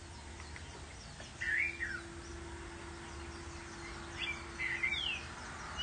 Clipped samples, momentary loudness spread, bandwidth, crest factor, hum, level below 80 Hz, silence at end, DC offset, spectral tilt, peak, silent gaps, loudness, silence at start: under 0.1%; 15 LU; 9.6 kHz; 20 dB; none; -54 dBFS; 0 s; under 0.1%; -2.5 dB/octave; -22 dBFS; none; -40 LUFS; 0 s